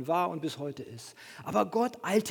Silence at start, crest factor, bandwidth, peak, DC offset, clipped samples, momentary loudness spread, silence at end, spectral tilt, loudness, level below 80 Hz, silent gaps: 0 s; 20 dB; 19 kHz; -12 dBFS; under 0.1%; under 0.1%; 16 LU; 0 s; -5 dB/octave; -31 LUFS; -76 dBFS; none